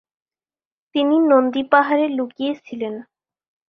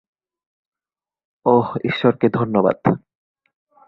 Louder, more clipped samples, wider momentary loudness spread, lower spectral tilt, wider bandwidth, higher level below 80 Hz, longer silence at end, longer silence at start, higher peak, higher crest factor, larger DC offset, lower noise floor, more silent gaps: about the same, -19 LUFS vs -19 LUFS; neither; first, 13 LU vs 6 LU; second, -6.5 dB/octave vs -9.5 dB/octave; about the same, 6 kHz vs 5.8 kHz; second, -68 dBFS vs -58 dBFS; second, 0.65 s vs 0.9 s; second, 0.95 s vs 1.45 s; about the same, -2 dBFS vs -2 dBFS; about the same, 18 dB vs 20 dB; neither; about the same, under -90 dBFS vs under -90 dBFS; neither